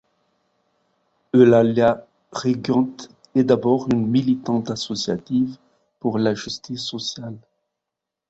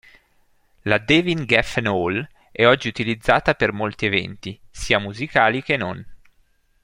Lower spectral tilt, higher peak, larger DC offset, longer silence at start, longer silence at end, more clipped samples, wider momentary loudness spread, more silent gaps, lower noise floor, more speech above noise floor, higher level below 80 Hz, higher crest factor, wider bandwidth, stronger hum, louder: about the same, -6 dB/octave vs -5 dB/octave; about the same, -2 dBFS vs -2 dBFS; neither; first, 1.35 s vs 0.85 s; first, 0.9 s vs 0.65 s; neither; about the same, 13 LU vs 15 LU; neither; first, -84 dBFS vs -60 dBFS; first, 65 dB vs 40 dB; second, -58 dBFS vs -44 dBFS; about the same, 20 dB vs 20 dB; second, 8 kHz vs 16 kHz; neither; about the same, -21 LUFS vs -20 LUFS